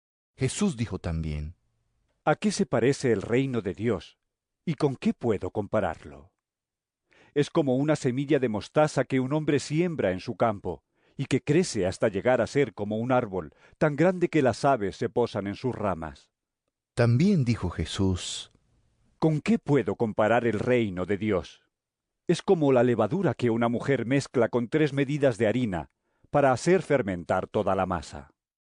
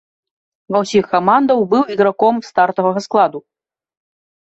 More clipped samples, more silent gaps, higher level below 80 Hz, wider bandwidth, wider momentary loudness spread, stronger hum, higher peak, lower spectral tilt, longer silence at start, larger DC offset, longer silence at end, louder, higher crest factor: neither; neither; first, -54 dBFS vs -60 dBFS; first, 10.5 kHz vs 8.2 kHz; first, 10 LU vs 5 LU; neither; second, -10 dBFS vs -2 dBFS; about the same, -6.5 dB/octave vs -6 dB/octave; second, 0.4 s vs 0.7 s; neither; second, 0.5 s vs 1.2 s; second, -26 LUFS vs -15 LUFS; about the same, 16 dB vs 16 dB